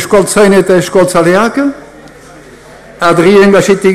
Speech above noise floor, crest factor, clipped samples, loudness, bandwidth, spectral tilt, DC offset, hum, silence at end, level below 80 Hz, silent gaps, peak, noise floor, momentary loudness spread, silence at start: 27 dB; 8 dB; under 0.1%; -7 LUFS; 15 kHz; -5 dB/octave; under 0.1%; none; 0 s; -40 dBFS; none; 0 dBFS; -33 dBFS; 8 LU; 0 s